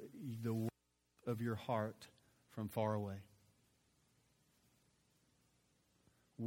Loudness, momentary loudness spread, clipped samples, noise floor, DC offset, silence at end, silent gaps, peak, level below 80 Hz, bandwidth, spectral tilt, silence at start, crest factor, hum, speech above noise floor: -43 LUFS; 16 LU; under 0.1%; -79 dBFS; under 0.1%; 0 s; none; -26 dBFS; -80 dBFS; 16.5 kHz; -7.5 dB/octave; 0 s; 20 dB; none; 38 dB